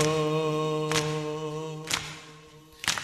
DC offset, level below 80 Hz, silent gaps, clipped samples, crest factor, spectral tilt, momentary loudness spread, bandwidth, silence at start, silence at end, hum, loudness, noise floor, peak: under 0.1%; -60 dBFS; none; under 0.1%; 24 dB; -4 dB/octave; 12 LU; 14 kHz; 0 s; 0 s; none; -29 LUFS; -51 dBFS; -6 dBFS